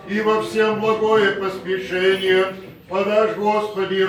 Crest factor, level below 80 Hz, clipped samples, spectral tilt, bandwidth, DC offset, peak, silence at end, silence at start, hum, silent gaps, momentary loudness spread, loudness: 14 dB; -58 dBFS; under 0.1%; -5 dB/octave; 18 kHz; under 0.1%; -4 dBFS; 0 s; 0 s; none; none; 8 LU; -19 LUFS